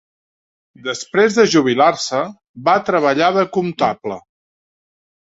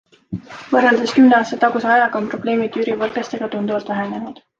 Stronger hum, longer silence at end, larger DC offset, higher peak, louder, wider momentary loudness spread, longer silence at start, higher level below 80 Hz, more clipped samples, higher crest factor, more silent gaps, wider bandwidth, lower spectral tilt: neither; first, 1 s vs 0.25 s; neither; about the same, 0 dBFS vs -2 dBFS; about the same, -16 LUFS vs -17 LUFS; about the same, 14 LU vs 16 LU; first, 0.85 s vs 0.3 s; about the same, -60 dBFS vs -58 dBFS; neither; about the same, 16 dB vs 16 dB; first, 2.49-2.54 s vs none; about the same, 8 kHz vs 7.8 kHz; about the same, -4.5 dB/octave vs -5.5 dB/octave